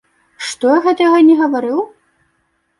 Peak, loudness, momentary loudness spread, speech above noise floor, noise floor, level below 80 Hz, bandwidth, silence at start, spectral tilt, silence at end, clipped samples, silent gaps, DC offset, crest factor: -2 dBFS; -13 LUFS; 16 LU; 52 dB; -64 dBFS; -64 dBFS; 11.5 kHz; 0.4 s; -3.5 dB/octave; 0.9 s; under 0.1%; none; under 0.1%; 12 dB